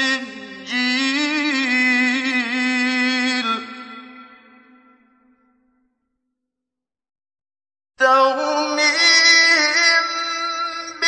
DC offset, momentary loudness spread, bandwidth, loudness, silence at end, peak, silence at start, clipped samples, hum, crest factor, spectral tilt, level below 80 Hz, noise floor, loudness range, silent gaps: under 0.1%; 14 LU; 9.6 kHz; -16 LUFS; 0 s; -2 dBFS; 0 s; under 0.1%; none; 18 dB; 0 dB/octave; -72 dBFS; -86 dBFS; 11 LU; none